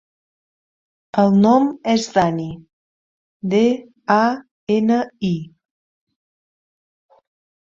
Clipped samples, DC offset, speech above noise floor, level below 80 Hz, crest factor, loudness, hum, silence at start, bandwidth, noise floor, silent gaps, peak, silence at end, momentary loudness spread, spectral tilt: under 0.1%; under 0.1%; over 73 dB; -58 dBFS; 18 dB; -18 LUFS; none; 1.15 s; 7.6 kHz; under -90 dBFS; 2.73-3.40 s, 4.51-4.67 s; -2 dBFS; 2.25 s; 13 LU; -6.5 dB/octave